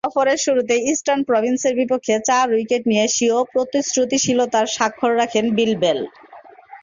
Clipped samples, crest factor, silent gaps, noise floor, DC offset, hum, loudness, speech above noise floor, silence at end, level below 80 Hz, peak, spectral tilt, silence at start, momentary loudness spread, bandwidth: under 0.1%; 16 dB; none; -42 dBFS; under 0.1%; none; -18 LUFS; 24 dB; 0.05 s; -62 dBFS; -4 dBFS; -3 dB/octave; 0.05 s; 3 LU; 7.6 kHz